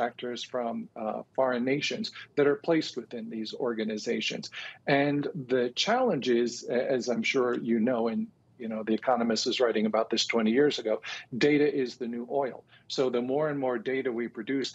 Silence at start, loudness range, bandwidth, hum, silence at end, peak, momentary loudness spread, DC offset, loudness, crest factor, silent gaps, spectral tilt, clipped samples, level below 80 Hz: 0 s; 3 LU; 8.2 kHz; none; 0 s; -12 dBFS; 10 LU; under 0.1%; -29 LUFS; 18 dB; none; -4.5 dB/octave; under 0.1%; -78 dBFS